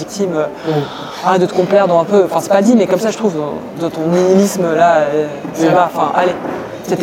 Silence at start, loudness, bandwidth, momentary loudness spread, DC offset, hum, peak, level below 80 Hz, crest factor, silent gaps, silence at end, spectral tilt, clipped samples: 0 s; -14 LUFS; 16.5 kHz; 10 LU; under 0.1%; none; 0 dBFS; -54 dBFS; 12 dB; none; 0 s; -6 dB/octave; under 0.1%